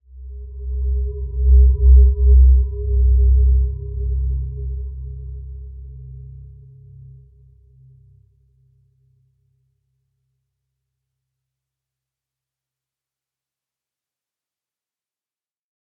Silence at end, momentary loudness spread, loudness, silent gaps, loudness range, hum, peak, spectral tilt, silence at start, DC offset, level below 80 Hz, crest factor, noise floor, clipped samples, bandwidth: 9.5 s; 25 LU; -17 LUFS; none; 22 LU; none; -2 dBFS; -17 dB/octave; 0.15 s; under 0.1%; -20 dBFS; 16 dB; under -90 dBFS; under 0.1%; 0.5 kHz